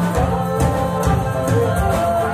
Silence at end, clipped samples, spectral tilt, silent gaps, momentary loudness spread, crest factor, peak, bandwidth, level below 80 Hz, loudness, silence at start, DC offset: 0 s; under 0.1%; -6.5 dB/octave; none; 2 LU; 14 dB; -4 dBFS; 15.5 kHz; -28 dBFS; -18 LUFS; 0 s; under 0.1%